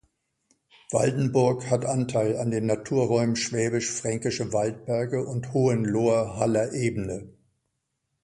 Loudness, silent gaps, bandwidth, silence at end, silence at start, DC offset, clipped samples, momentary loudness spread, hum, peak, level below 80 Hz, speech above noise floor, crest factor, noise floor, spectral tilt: -26 LUFS; none; 11.5 kHz; 0.95 s; 0.9 s; under 0.1%; under 0.1%; 5 LU; none; -8 dBFS; -56 dBFS; 54 dB; 18 dB; -78 dBFS; -5.5 dB/octave